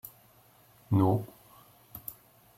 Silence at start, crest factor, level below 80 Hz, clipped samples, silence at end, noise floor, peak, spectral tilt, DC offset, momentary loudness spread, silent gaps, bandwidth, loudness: 0.05 s; 20 dB; -64 dBFS; under 0.1%; 0.45 s; -61 dBFS; -12 dBFS; -9 dB/octave; under 0.1%; 22 LU; none; 16.5 kHz; -30 LUFS